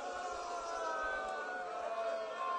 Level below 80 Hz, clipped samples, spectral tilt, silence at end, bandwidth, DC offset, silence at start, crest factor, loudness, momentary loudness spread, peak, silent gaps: -68 dBFS; under 0.1%; -1.5 dB/octave; 0 s; 10.5 kHz; under 0.1%; 0 s; 12 dB; -40 LUFS; 4 LU; -28 dBFS; none